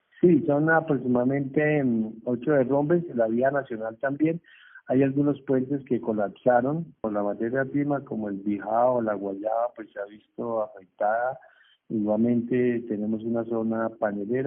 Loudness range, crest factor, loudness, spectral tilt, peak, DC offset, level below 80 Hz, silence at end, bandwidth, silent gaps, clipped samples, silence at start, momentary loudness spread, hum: 4 LU; 18 dB; -26 LUFS; -8 dB/octave; -8 dBFS; under 0.1%; -68 dBFS; 0 s; 3.6 kHz; none; under 0.1%; 0.2 s; 9 LU; none